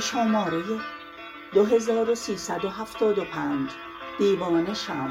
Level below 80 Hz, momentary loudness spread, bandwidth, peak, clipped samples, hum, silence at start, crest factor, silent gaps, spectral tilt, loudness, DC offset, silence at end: -60 dBFS; 15 LU; 16 kHz; -8 dBFS; under 0.1%; none; 0 s; 18 dB; none; -4.5 dB/octave; -25 LUFS; under 0.1%; 0 s